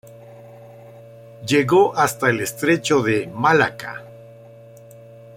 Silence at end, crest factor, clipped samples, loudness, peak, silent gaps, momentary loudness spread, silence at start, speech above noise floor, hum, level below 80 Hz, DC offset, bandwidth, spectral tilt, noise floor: 1.1 s; 18 dB; under 0.1%; -18 LUFS; -2 dBFS; none; 17 LU; 0.15 s; 25 dB; none; -60 dBFS; under 0.1%; 16.5 kHz; -5 dB/octave; -43 dBFS